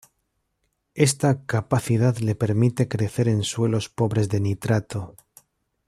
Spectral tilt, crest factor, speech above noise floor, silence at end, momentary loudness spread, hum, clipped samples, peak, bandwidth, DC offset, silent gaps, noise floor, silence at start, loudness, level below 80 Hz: -6 dB/octave; 20 dB; 52 dB; 0.75 s; 4 LU; none; under 0.1%; -4 dBFS; 14.5 kHz; under 0.1%; none; -74 dBFS; 0.95 s; -23 LUFS; -56 dBFS